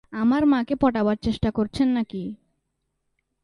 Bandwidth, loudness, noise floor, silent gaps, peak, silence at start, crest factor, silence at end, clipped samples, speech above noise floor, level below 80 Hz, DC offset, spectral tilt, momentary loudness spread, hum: 11 kHz; -23 LUFS; -76 dBFS; none; -8 dBFS; 0.1 s; 16 dB; 1.1 s; under 0.1%; 54 dB; -46 dBFS; under 0.1%; -7.5 dB/octave; 10 LU; none